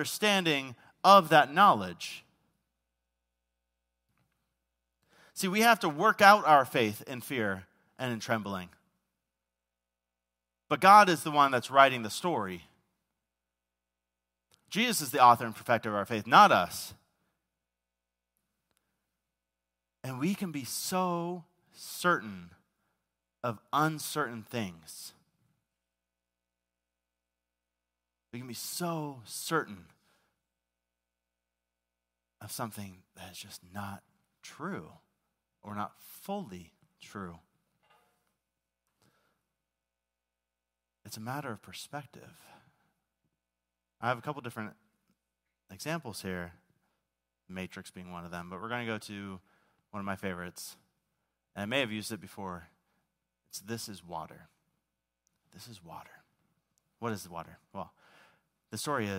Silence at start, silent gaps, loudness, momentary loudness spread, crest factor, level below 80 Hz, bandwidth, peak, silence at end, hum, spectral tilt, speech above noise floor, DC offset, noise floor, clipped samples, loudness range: 0 s; none; -28 LUFS; 24 LU; 26 dB; -76 dBFS; 16 kHz; -6 dBFS; 0 s; 60 Hz at -65 dBFS; -4 dB/octave; 59 dB; under 0.1%; -89 dBFS; under 0.1%; 20 LU